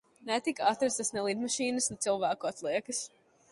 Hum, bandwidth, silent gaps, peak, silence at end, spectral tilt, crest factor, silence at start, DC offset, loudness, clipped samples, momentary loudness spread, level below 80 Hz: none; 11.5 kHz; none; -12 dBFS; 0.45 s; -2.5 dB/octave; 20 dB; 0.2 s; under 0.1%; -32 LUFS; under 0.1%; 6 LU; -72 dBFS